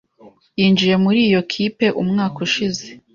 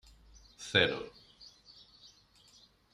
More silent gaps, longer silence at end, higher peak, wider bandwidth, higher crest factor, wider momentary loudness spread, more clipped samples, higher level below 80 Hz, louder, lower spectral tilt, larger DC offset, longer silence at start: neither; second, 0.15 s vs 0.85 s; first, -4 dBFS vs -12 dBFS; second, 7.4 kHz vs 13.5 kHz; second, 14 dB vs 28 dB; second, 8 LU vs 28 LU; neither; first, -56 dBFS vs -66 dBFS; first, -17 LUFS vs -30 LUFS; first, -5.5 dB/octave vs -3.5 dB/octave; neither; second, 0.25 s vs 0.6 s